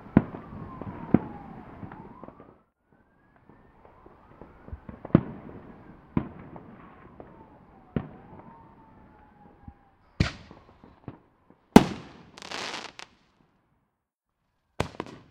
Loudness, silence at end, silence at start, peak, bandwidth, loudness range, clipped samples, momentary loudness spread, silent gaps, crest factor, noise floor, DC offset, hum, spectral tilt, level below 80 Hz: -28 LUFS; 0.15 s; 0.15 s; 0 dBFS; 15.5 kHz; 16 LU; under 0.1%; 25 LU; none; 32 dB; -82 dBFS; under 0.1%; none; -6.5 dB/octave; -50 dBFS